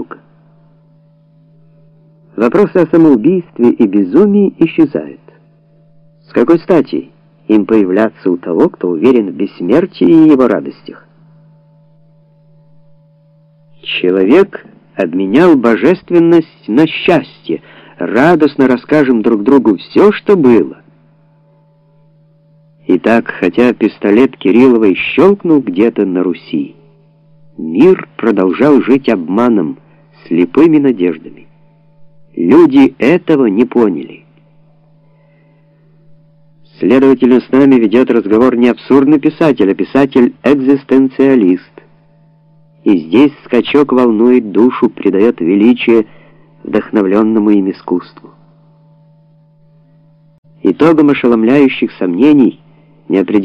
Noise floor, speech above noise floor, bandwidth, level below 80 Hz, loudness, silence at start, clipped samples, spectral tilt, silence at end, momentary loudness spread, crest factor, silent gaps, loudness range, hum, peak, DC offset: -48 dBFS; 39 dB; 7 kHz; -52 dBFS; -10 LUFS; 0 s; 0.3%; -8 dB/octave; 0 s; 11 LU; 10 dB; 50.38-50.43 s; 6 LU; none; 0 dBFS; under 0.1%